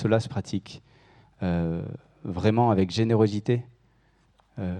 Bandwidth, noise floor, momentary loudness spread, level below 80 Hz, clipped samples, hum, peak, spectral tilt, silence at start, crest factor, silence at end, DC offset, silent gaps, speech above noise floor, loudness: 9.6 kHz; -63 dBFS; 17 LU; -54 dBFS; under 0.1%; none; -8 dBFS; -7.5 dB/octave; 0 s; 20 dB; 0 s; under 0.1%; none; 39 dB; -26 LUFS